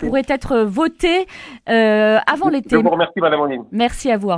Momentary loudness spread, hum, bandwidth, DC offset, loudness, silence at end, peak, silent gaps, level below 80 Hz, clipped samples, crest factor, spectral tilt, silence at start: 6 LU; none; 11 kHz; under 0.1%; -16 LUFS; 0 s; 0 dBFS; none; -40 dBFS; under 0.1%; 16 dB; -5.5 dB/octave; 0 s